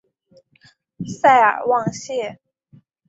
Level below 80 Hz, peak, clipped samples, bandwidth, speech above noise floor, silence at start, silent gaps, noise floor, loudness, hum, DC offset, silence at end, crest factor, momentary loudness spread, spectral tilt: -64 dBFS; -2 dBFS; under 0.1%; 8 kHz; 39 dB; 1 s; none; -56 dBFS; -17 LUFS; none; under 0.1%; 0.75 s; 20 dB; 19 LU; -4.5 dB/octave